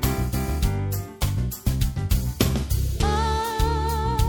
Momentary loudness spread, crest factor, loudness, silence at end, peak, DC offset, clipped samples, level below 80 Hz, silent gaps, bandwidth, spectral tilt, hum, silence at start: 4 LU; 20 dB; -25 LUFS; 0 s; -4 dBFS; under 0.1%; under 0.1%; -26 dBFS; none; 17.5 kHz; -5.5 dB/octave; none; 0 s